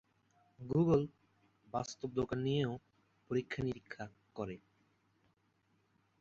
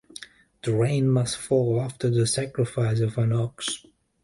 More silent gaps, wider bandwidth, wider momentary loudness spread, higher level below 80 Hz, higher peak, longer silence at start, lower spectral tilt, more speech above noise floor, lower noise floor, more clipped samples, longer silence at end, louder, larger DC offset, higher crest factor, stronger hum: neither; second, 7.8 kHz vs 11.5 kHz; first, 17 LU vs 10 LU; second, -66 dBFS vs -56 dBFS; second, -18 dBFS vs -10 dBFS; first, 0.6 s vs 0.2 s; about the same, -6.5 dB/octave vs -6 dB/octave; first, 40 dB vs 22 dB; first, -76 dBFS vs -46 dBFS; neither; first, 1.65 s vs 0.45 s; second, -38 LUFS vs -25 LUFS; neither; first, 20 dB vs 14 dB; neither